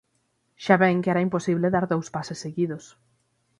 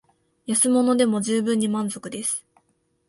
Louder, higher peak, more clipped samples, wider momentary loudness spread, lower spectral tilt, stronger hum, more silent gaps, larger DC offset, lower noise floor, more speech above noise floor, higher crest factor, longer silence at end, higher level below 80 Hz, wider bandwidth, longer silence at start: about the same, -24 LUFS vs -22 LUFS; about the same, -4 dBFS vs -6 dBFS; neither; about the same, 13 LU vs 11 LU; first, -6.5 dB/octave vs -4 dB/octave; neither; neither; neither; about the same, -71 dBFS vs -68 dBFS; about the same, 48 dB vs 46 dB; first, 22 dB vs 16 dB; about the same, 0.75 s vs 0.7 s; about the same, -64 dBFS vs -68 dBFS; about the same, 11 kHz vs 12 kHz; about the same, 0.6 s vs 0.5 s